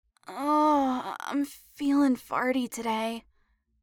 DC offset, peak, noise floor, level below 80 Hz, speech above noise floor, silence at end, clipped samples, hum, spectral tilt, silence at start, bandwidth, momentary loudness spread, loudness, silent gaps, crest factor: under 0.1%; -14 dBFS; -70 dBFS; -66 dBFS; 42 dB; 0.65 s; under 0.1%; none; -4 dB/octave; 0.3 s; 18 kHz; 11 LU; -28 LUFS; none; 16 dB